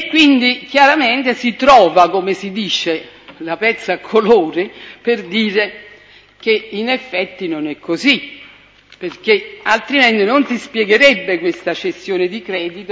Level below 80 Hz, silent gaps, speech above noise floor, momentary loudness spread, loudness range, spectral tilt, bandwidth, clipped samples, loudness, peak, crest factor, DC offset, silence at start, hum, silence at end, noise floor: -54 dBFS; none; 30 dB; 12 LU; 6 LU; -4 dB/octave; 8 kHz; under 0.1%; -14 LUFS; 0 dBFS; 16 dB; under 0.1%; 0 s; 50 Hz at -60 dBFS; 0 s; -45 dBFS